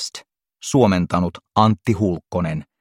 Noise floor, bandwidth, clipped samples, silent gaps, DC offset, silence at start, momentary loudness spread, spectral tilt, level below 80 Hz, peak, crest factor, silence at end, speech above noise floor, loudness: -42 dBFS; 14 kHz; under 0.1%; none; under 0.1%; 0 s; 12 LU; -6 dB/octave; -48 dBFS; -2 dBFS; 18 dB; 0.2 s; 23 dB; -20 LUFS